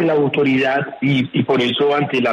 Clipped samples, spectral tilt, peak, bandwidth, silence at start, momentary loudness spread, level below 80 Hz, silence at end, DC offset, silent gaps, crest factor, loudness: under 0.1%; -7 dB/octave; -4 dBFS; 8.6 kHz; 0 s; 3 LU; -60 dBFS; 0 s; under 0.1%; none; 12 dB; -17 LUFS